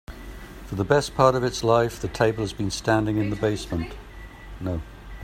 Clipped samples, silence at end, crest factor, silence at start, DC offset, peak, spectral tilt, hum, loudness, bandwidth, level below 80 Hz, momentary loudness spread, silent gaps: under 0.1%; 0 s; 22 dB; 0.1 s; under 0.1%; -2 dBFS; -5.5 dB/octave; none; -24 LUFS; 16 kHz; -42 dBFS; 21 LU; none